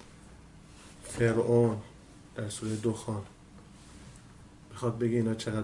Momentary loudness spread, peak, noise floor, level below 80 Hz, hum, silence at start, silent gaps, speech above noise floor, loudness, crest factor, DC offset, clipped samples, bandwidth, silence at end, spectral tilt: 26 LU; -12 dBFS; -53 dBFS; -58 dBFS; none; 0 s; none; 24 dB; -31 LUFS; 20 dB; under 0.1%; under 0.1%; 11.5 kHz; 0 s; -6.5 dB/octave